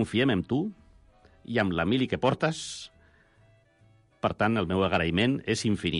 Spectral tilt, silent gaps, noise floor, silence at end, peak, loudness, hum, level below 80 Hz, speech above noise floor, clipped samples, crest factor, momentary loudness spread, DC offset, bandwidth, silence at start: -5.5 dB/octave; none; -61 dBFS; 0 s; -12 dBFS; -27 LUFS; none; -54 dBFS; 35 dB; under 0.1%; 16 dB; 10 LU; under 0.1%; 11.5 kHz; 0 s